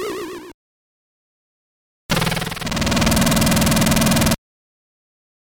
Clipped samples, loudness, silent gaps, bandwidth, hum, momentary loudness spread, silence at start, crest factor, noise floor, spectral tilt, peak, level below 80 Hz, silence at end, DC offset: under 0.1%; -18 LUFS; 0.54-2.09 s; over 20 kHz; none; 12 LU; 0 s; 16 dB; under -90 dBFS; -4 dB/octave; -6 dBFS; -32 dBFS; 1.15 s; under 0.1%